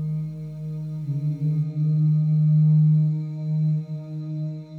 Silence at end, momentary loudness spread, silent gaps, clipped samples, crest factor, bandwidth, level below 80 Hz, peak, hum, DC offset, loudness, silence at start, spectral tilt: 0 s; 14 LU; none; under 0.1%; 10 dB; 4 kHz; -60 dBFS; -12 dBFS; none; under 0.1%; -23 LUFS; 0 s; -11.5 dB/octave